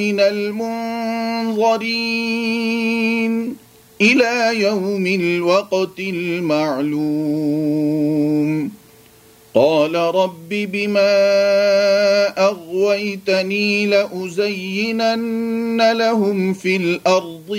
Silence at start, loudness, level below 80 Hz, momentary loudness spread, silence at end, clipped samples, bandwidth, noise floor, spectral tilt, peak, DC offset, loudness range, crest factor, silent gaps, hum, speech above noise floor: 0 s; -17 LUFS; -66 dBFS; 7 LU; 0 s; under 0.1%; 16 kHz; -47 dBFS; -5 dB/octave; -2 dBFS; under 0.1%; 3 LU; 16 dB; none; none; 30 dB